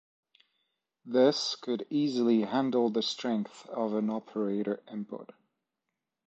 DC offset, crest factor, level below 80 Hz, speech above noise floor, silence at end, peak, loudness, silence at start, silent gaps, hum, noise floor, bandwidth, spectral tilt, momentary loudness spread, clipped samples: under 0.1%; 20 dB; -82 dBFS; 57 dB; 1.1 s; -12 dBFS; -30 LUFS; 1.05 s; none; none; -86 dBFS; 8.2 kHz; -5 dB/octave; 12 LU; under 0.1%